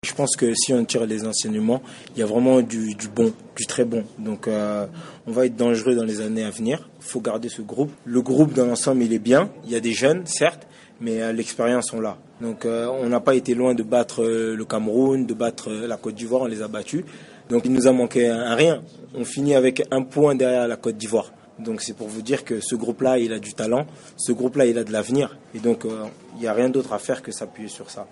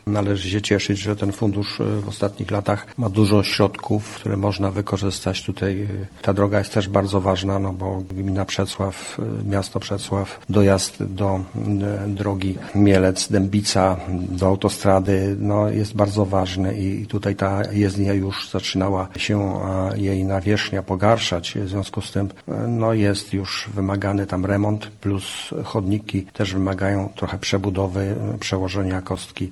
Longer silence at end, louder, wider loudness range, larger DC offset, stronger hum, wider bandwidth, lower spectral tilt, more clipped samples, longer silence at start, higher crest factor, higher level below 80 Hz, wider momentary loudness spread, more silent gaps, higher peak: about the same, 0.05 s vs 0 s; about the same, -22 LUFS vs -22 LUFS; about the same, 4 LU vs 4 LU; neither; neither; about the same, 11.5 kHz vs 12 kHz; second, -4.5 dB/octave vs -6 dB/octave; neither; about the same, 0.05 s vs 0.05 s; about the same, 18 dB vs 20 dB; second, -64 dBFS vs -48 dBFS; first, 12 LU vs 8 LU; neither; second, -4 dBFS vs 0 dBFS